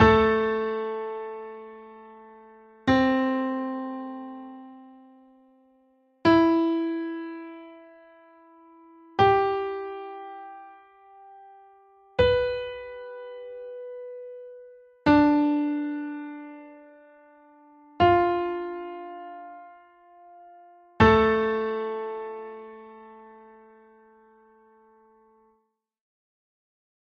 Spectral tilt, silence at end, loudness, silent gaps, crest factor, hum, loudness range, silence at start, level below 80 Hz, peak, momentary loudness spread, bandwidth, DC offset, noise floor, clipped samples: -7.5 dB/octave; 3.7 s; -24 LUFS; none; 22 dB; none; 4 LU; 0 s; -48 dBFS; -4 dBFS; 25 LU; 7 kHz; under 0.1%; -73 dBFS; under 0.1%